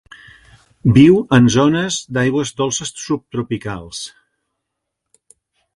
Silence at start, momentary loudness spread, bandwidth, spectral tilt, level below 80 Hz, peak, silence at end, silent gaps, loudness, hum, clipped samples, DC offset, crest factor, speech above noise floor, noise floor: 0.85 s; 17 LU; 11.5 kHz; -5.5 dB/octave; -44 dBFS; 0 dBFS; 1.65 s; none; -15 LUFS; none; under 0.1%; under 0.1%; 18 dB; 63 dB; -78 dBFS